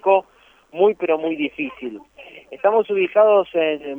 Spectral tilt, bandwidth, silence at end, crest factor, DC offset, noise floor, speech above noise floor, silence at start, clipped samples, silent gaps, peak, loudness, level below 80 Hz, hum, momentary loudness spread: -7 dB/octave; 3.7 kHz; 0 s; 16 dB; under 0.1%; -54 dBFS; 35 dB; 0.05 s; under 0.1%; none; -4 dBFS; -19 LUFS; -64 dBFS; none; 18 LU